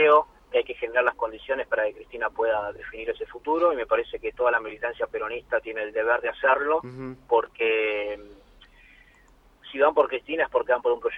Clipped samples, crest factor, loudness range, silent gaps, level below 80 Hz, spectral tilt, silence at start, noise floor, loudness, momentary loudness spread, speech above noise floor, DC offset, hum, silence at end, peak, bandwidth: under 0.1%; 18 dB; 2 LU; none; -56 dBFS; -6 dB/octave; 0 s; -57 dBFS; -25 LUFS; 10 LU; 32 dB; under 0.1%; none; 0 s; -6 dBFS; 4.9 kHz